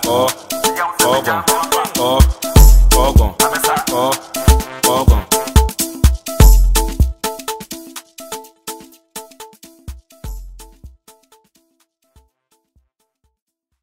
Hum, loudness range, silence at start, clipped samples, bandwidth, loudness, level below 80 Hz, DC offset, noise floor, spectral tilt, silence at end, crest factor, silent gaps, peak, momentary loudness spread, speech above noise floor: none; 20 LU; 0 s; under 0.1%; 16.5 kHz; -14 LUFS; -16 dBFS; under 0.1%; -66 dBFS; -4 dB/octave; 2.95 s; 14 dB; none; 0 dBFS; 22 LU; 52 dB